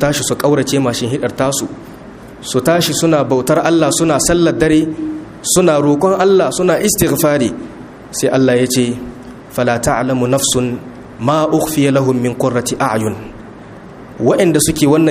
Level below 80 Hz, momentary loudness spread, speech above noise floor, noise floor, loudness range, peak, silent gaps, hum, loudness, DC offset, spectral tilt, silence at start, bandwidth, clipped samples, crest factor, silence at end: -40 dBFS; 19 LU; 21 dB; -34 dBFS; 3 LU; 0 dBFS; none; none; -13 LUFS; under 0.1%; -4.5 dB/octave; 0 s; 15.5 kHz; under 0.1%; 14 dB; 0 s